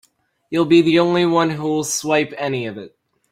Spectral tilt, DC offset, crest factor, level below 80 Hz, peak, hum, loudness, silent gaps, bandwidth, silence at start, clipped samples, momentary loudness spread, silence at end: -4.5 dB/octave; under 0.1%; 16 dB; -60 dBFS; -2 dBFS; none; -17 LUFS; none; 15 kHz; 0.5 s; under 0.1%; 12 LU; 0.45 s